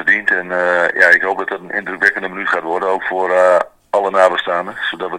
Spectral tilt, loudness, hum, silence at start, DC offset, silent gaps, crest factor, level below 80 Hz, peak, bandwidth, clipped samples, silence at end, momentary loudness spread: -3.5 dB/octave; -15 LUFS; none; 0 s; under 0.1%; none; 16 dB; -60 dBFS; 0 dBFS; 11 kHz; 0.1%; 0 s; 10 LU